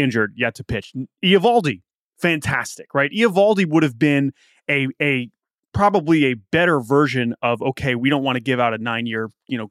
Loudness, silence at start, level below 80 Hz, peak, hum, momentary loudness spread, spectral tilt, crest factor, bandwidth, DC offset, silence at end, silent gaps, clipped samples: -19 LUFS; 0 s; -50 dBFS; -4 dBFS; none; 11 LU; -6 dB/octave; 16 dB; 14.5 kHz; under 0.1%; 0.05 s; 1.95-2.11 s, 5.59-5.72 s; under 0.1%